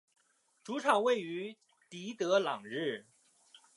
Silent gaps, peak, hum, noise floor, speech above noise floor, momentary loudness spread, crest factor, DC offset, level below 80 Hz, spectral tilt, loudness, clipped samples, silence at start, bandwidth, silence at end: none; -14 dBFS; none; -70 dBFS; 37 dB; 16 LU; 22 dB; under 0.1%; under -90 dBFS; -4 dB/octave; -33 LUFS; under 0.1%; 0.65 s; 11.5 kHz; 0.75 s